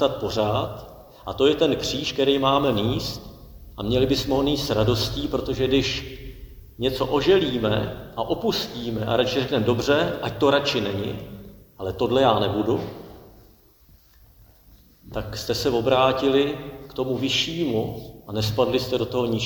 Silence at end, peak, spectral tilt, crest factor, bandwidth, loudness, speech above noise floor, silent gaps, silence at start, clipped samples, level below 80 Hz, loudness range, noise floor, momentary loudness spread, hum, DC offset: 0 s; -4 dBFS; -5.5 dB/octave; 18 dB; over 20 kHz; -23 LUFS; 32 dB; none; 0 s; under 0.1%; -44 dBFS; 3 LU; -54 dBFS; 15 LU; none; under 0.1%